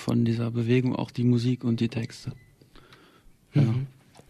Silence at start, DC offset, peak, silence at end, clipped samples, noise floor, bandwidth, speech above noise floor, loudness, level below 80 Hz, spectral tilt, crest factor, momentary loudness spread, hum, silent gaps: 0 s; under 0.1%; -12 dBFS; 0.4 s; under 0.1%; -56 dBFS; 11.5 kHz; 31 dB; -26 LUFS; -58 dBFS; -8 dB/octave; 16 dB; 13 LU; none; none